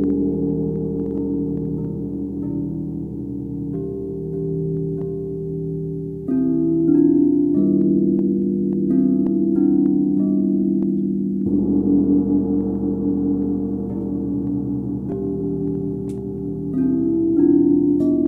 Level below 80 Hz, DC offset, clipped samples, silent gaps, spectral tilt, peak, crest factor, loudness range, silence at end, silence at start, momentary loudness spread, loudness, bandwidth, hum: -42 dBFS; under 0.1%; under 0.1%; none; -13 dB/octave; -4 dBFS; 14 dB; 8 LU; 0 s; 0 s; 10 LU; -20 LUFS; 1.7 kHz; none